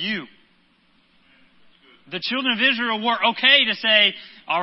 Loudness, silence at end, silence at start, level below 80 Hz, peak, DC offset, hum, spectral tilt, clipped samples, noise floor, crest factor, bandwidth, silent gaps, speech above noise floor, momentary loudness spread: -18 LUFS; 0 s; 0 s; -74 dBFS; -2 dBFS; under 0.1%; none; -6.5 dB/octave; under 0.1%; -60 dBFS; 22 dB; 5.8 kHz; none; 40 dB; 15 LU